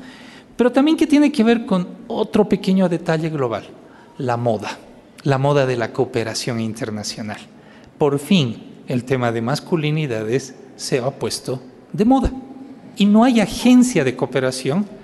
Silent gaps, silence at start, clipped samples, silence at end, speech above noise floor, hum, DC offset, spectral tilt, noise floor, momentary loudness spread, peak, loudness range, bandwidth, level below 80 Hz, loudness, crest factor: none; 0 s; under 0.1%; 0 s; 23 dB; none; under 0.1%; -6 dB/octave; -41 dBFS; 16 LU; -4 dBFS; 5 LU; 12.5 kHz; -42 dBFS; -19 LUFS; 14 dB